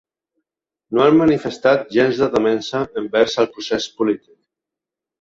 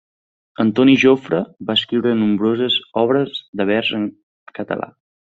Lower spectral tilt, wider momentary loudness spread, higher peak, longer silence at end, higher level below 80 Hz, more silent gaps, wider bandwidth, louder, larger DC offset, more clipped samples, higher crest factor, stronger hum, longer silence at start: about the same, -5.5 dB/octave vs -6 dB/octave; second, 9 LU vs 13 LU; about the same, -2 dBFS vs -2 dBFS; first, 1.05 s vs 0.5 s; first, -54 dBFS vs -60 dBFS; second, none vs 3.48-3.53 s, 4.23-4.46 s; about the same, 7.8 kHz vs 7.4 kHz; about the same, -18 LUFS vs -17 LUFS; neither; neither; about the same, 16 dB vs 16 dB; neither; first, 0.9 s vs 0.6 s